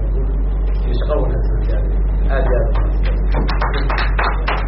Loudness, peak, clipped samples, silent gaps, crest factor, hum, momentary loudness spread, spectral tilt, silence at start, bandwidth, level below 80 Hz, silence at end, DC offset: -19 LUFS; -4 dBFS; under 0.1%; none; 12 dB; none; 3 LU; -5.5 dB/octave; 0 s; 5.6 kHz; -16 dBFS; 0 s; under 0.1%